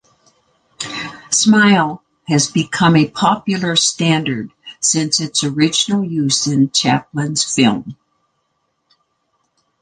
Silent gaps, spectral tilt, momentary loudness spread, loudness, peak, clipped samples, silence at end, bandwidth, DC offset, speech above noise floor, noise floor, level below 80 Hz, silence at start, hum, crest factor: none; -3.5 dB/octave; 13 LU; -15 LUFS; -2 dBFS; under 0.1%; 1.9 s; 10 kHz; under 0.1%; 53 dB; -68 dBFS; -56 dBFS; 0.8 s; none; 16 dB